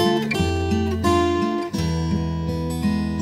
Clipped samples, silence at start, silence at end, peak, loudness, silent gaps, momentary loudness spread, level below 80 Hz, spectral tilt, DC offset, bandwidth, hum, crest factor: under 0.1%; 0 s; 0 s; -6 dBFS; -22 LUFS; none; 5 LU; -34 dBFS; -6.5 dB/octave; under 0.1%; 16 kHz; none; 16 dB